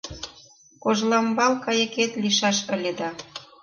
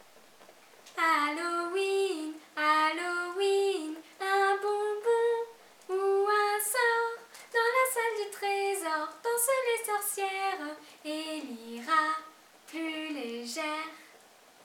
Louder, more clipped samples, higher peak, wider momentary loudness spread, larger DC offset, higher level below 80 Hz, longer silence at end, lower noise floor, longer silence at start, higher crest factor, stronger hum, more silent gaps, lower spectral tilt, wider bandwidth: first, -23 LUFS vs -30 LUFS; neither; first, -8 dBFS vs -14 dBFS; first, 17 LU vs 12 LU; neither; first, -58 dBFS vs under -90 dBFS; second, 0.2 s vs 0.6 s; second, -52 dBFS vs -58 dBFS; second, 0.05 s vs 0.4 s; about the same, 18 dB vs 18 dB; neither; neither; first, -3 dB/octave vs 0 dB/octave; second, 10.5 kHz vs 18.5 kHz